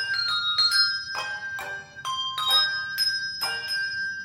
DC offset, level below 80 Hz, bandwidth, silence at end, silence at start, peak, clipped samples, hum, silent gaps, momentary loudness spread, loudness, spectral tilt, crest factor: under 0.1%; -66 dBFS; 16.5 kHz; 0 s; 0 s; -10 dBFS; under 0.1%; none; none; 12 LU; -24 LUFS; 1 dB/octave; 18 dB